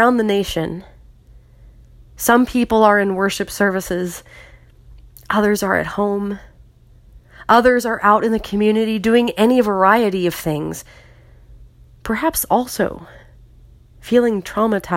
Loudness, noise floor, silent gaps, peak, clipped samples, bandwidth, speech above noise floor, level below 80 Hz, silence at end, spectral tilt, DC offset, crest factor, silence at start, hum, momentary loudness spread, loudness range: -17 LUFS; -47 dBFS; none; 0 dBFS; under 0.1%; 16.5 kHz; 31 dB; -44 dBFS; 0 s; -5 dB/octave; under 0.1%; 18 dB; 0 s; none; 13 LU; 7 LU